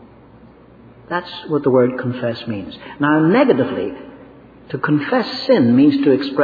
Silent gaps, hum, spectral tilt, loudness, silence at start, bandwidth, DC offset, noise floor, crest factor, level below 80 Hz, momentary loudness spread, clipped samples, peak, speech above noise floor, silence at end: none; none; -8.5 dB/octave; -17 LUFS; 1.1 s; 5 kHz; under 0.1%; -44 dBFS; 16 dB; -56 dBFS; 14 LU; under 0.1%; -2 dBFS; 28 dB; 0 s